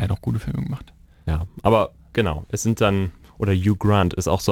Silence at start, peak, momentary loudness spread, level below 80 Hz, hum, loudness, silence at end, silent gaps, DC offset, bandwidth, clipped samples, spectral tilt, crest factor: 0 s; -4 dBFS; 9 LU; -36 dBFS; none; -22 LUFS; 0 s; none; under 0.1%; 16.5 kHz; under 0.1%; -6 dB/octave; 18 dB